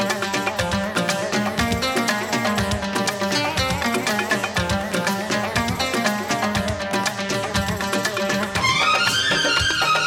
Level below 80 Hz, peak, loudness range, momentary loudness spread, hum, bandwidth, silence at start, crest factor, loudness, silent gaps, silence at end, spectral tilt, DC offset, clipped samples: -40 dBFS; -6 dBFS; 2 LU; 5 LU; none; 18 kHz; 0 s; 16 dB; -21 LUFS; none; 0 s; -3.5 dB/octave; under 0.1%; under 0.1%